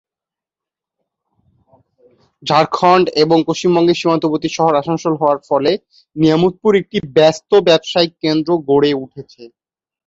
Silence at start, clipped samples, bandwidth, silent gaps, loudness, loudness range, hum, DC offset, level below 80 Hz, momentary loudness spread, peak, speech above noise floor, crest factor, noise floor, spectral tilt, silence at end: 2.45 s; under 0.1%; 7.8 kHz; none; -14 LUFS; 3 LU; none; under 0.1%; -56 dBFS; 7 LU; 0 dBFS; 73 dB; 14 dB; -88 dBFS; -5.5 dB/octave; 0.6 s